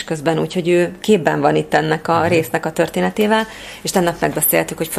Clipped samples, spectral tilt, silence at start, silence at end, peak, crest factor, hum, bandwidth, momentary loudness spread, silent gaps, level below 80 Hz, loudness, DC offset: under 0.1%; -4.5 dB/octave; 0 s; 0 s; 0 dBFS; 16 dB; none; 15.5 kHz; 4 LU; none; -50 dBFS; -17 LUFS; under 0.1%